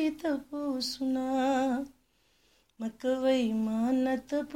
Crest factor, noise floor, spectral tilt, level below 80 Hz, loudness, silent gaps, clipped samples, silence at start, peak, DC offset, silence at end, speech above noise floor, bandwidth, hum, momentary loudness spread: 14 dB; -69 dBFS; -5 dB/octave; -66 dBFS; -30 LUFS; none; under 0.1%; 0 s; -16 dBFS; under 0.1%; 0 s; 39 dB; 16 kHz; none; 8 LU